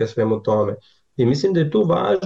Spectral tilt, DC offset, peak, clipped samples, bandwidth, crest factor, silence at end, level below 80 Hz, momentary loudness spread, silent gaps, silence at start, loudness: -7.5 dB/octave; 0.1%; -8 dBFS; under 0.1%; 7.8 kHz; 10 dB; 0 s; -56 dBFS; 9 LU; none; 0 s; -19 LUFS